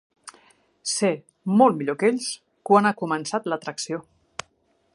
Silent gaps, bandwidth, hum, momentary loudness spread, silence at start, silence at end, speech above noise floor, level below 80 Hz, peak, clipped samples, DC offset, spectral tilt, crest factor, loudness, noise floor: none; 11.5 kHz; none; 18 LU; 0.25 s; 0.95 s; 45 dB; -72 dBFS; -4 dBFS; under 0.1%; under 0.1%; -4.5 dB/octave; 22 dB; -23 LUFS; -66 dBFS